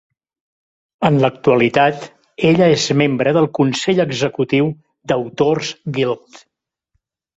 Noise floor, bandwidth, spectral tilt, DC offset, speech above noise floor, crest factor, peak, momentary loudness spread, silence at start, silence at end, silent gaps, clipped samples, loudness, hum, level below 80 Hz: -70 dBFS; 8 kHz; -5.5 dB/octave; under 0.1%; 55 dB; 16 dB; -2 dBFS; 8 LU; 1 s; 1.2 s; none; under 0.1%; -16 LUFS; none; -54 dBFS